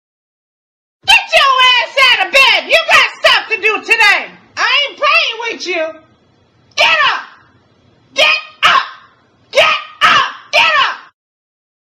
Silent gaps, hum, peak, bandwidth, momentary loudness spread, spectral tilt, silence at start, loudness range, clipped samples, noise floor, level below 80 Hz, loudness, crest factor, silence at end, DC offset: none; none; 0 dBFS; over 20 kHz; 12 LU; 0 dB/octave; 1.05 s; 5 LU; 0.2%; -52 dBFS; -54 dBFS; -10 LUFS; 14 dB; 1 s; under 0.1%